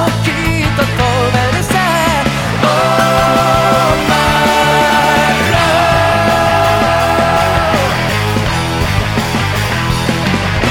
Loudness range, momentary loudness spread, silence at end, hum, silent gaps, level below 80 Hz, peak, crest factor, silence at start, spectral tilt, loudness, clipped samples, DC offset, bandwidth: 3 LU; 4 LU; 0 s; none; none; -28 dBFS; 0 dBFS; 12 dB; 0 s; -4.5 dB/octave; -11 LUFS; under 0.1%; under 0.1%; 19 kHz